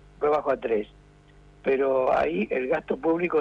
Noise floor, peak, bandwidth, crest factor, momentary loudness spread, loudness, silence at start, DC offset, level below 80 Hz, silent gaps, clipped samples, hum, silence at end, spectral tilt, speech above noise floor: -53 dBFS; -12 dBFS; 7.4 kHz; 14 dB; 6 LU; -25 LUFS; 0.2 s; under 0.1%; -54 dBFS; none; under 0.1%; 50 Hz at -55 dBFS; 0 s; -7.5 dB/octave; 28 dB